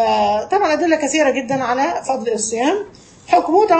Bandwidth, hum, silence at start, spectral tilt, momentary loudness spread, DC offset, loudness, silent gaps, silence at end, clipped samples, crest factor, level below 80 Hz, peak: 8.8 kHz; none; 0 s; -3 dB/octave; 6 LU; under 0.1%; -17 LUFS; none; 0 s; under 0.1%; 16 dB; -54 dBFS; -2 dBFS